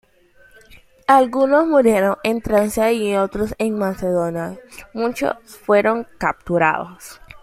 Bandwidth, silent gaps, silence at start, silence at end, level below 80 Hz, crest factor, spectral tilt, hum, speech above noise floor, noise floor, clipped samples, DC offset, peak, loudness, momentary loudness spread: 16 kHz; none; 0.75 s; 0.05 s; -46 dBFS; 18 dB; -5.5 dB/octave; none; 34 dB; -52 dBFS; under 0.1%; under 0.1%; -2 dBFS; -18 LUFS; 15 LU